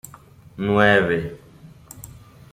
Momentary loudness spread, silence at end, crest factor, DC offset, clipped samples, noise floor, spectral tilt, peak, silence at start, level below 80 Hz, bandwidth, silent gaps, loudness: 26 LU; 0.45 s; 20 dB; under 0.1%; under 0.1%; -46 dBFS; -6 dB/octave; -2 dBFS; 0.55 s; -50 dBFS; 16 kHz; none; -19 LUFS